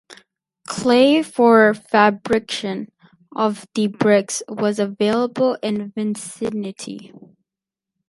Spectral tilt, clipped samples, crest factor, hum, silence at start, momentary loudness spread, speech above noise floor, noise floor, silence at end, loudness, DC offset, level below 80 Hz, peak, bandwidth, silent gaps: -4.5 dB/octave; under 0.1%; 18 dB; none; 0.1 s; 16 LU; 69 dB; -87 dBFS; 1 s; -18 LUFS; under 0.1%; -62 dBFS; 0 dBFS; 11.5 kHz; none